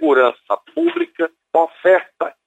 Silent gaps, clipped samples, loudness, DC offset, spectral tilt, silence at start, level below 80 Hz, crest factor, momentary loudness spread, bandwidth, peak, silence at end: none; under 0.1%; -18 LUFS; under 0.1%; -5 dB/octave; 0 s; -74 dBFS; 14 dB; 10 LU; 8 kHz; -2 dBFS; 0.15 s